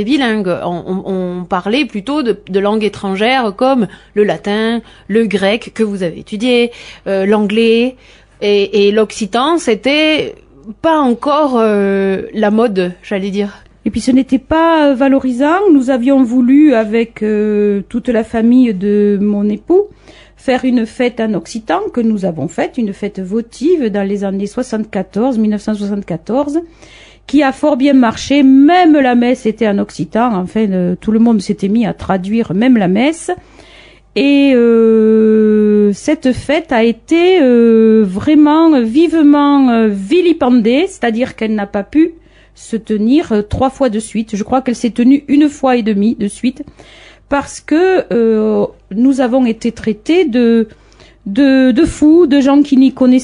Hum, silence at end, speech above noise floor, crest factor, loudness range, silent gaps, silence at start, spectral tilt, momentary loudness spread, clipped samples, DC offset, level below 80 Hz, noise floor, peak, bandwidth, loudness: none; 0 s; 29 dB; 10 dB; 6 LU; none; 0 s; -6 dB/octave; 10 LU; under 0.1%; under 0.1%; -42 dBFS; -41 dBFS; 0 dBFS; 11 kHz; -12 LUFS